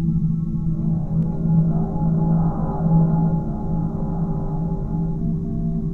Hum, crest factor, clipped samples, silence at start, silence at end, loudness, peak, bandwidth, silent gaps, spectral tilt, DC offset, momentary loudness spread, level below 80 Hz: none; 14 dB; under 0.1%; 0 s; 0 s; -22 LUFS; -6 dBFS; 1.6 kHz; none; -13 dB/octave; 0.9%; 6 LU; -30 dBFS